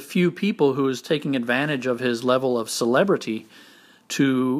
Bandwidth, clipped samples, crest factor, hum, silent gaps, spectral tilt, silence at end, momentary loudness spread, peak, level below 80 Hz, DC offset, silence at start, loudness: 15.5 kHz; under 0.1%; 16 dB; none; none; -5 dB/octave; 0 s; 5 LU; -6 dBFS; -74 dBFS; under 0.1%; 0 s; -22 LUFS